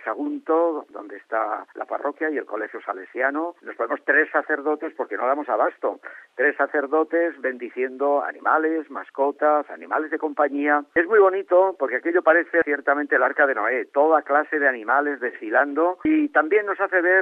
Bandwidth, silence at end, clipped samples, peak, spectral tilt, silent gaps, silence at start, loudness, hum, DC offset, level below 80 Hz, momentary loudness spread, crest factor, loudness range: 3.9 kHz; 0 s; under 0.1%; -4 dBFS; -6.5 dB/octave; none; 0 s; -22 LUFS; none; under 0.1%; -72 dBFS; 11 LU; 18 dB; 5 LU